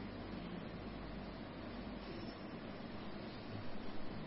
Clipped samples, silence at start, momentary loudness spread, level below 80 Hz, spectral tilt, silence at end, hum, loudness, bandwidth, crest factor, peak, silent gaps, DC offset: under 0.1%; 0 s; 1 LU; -58 dBFS; -5 dB/octave; 0 s; none; -49 LUFS; 5.6 kHz; 14 dB; -32 dBFS; none; under 0.1%